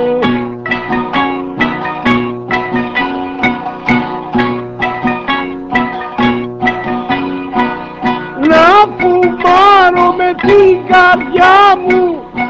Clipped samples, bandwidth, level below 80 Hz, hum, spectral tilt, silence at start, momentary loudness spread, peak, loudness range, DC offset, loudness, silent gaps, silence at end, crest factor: 0.4%; 8 kHz; -40 dBFS; none; -6 dB/octave; 0 s; 11 LU; 0 dBFS; 8 LU; under 0.1%; -11 LUFS; none; 0 s; 10 dB